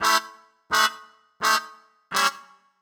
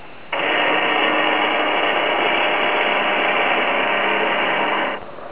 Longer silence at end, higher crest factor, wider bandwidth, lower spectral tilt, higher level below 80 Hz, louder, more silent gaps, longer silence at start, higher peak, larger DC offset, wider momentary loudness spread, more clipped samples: first, 0.4 s vs 0 s; first, 20 dB vs 14 dB; first, over 20 kHz vs 4 kHz; second, 0.5 dB/octave vs -6.5 dB/octave; second, -68 dBFS vs -60 dBFS; second, -23 LUFS vs -17 LUFS; neither; about the same, 0 s vs 0 s; about the same, -6 dBFS vs -6 dBFS; second, under 0.1% vs 1%; first, 23 LU vs 4 LU; neither